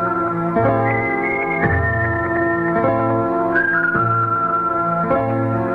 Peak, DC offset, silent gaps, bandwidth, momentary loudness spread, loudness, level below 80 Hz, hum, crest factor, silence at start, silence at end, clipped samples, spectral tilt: -4 dBFS; under 0.1%; none; 4.9 kHz; 3 LU; -18 LUFS; -40 dBFS; none; 14 dB; 0 s; 0 s; under 0.1%; -10 dB/octave